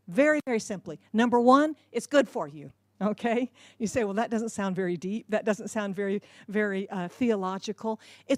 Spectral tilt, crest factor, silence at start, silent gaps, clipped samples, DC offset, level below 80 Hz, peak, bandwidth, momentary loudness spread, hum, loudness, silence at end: -5.5 dB/octave; 20 dB; 0.1 s; none; under 0.1%; under 0.1%; -70 dBFS; -8 dBFS; 14 kHz; 13 LU; none; -28 LUFS; 0 s